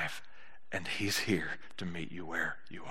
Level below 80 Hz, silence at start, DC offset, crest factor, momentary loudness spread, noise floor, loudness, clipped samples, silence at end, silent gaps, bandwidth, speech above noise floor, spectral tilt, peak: -70 dBFS; 0 s; 0.9%; 20 dB; 10 LU; -60 dBFS; -36 LUFS; under 0.1%; 0 s; none; 14 kHz; 23 dB; -3.5 dB/octave; -18 dBFS